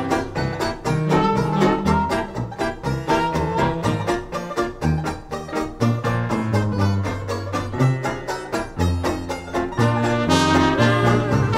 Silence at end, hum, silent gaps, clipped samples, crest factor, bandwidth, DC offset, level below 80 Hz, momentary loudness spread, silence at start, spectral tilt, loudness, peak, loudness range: 0 s; none; none; under 0.1%; 18 dB; 15.5 kHz; under 0.1%; -38 dBFS; 9 LU; 0 s; -6 dB/octave; -21 LUFS; -2 dBFS; 3 LU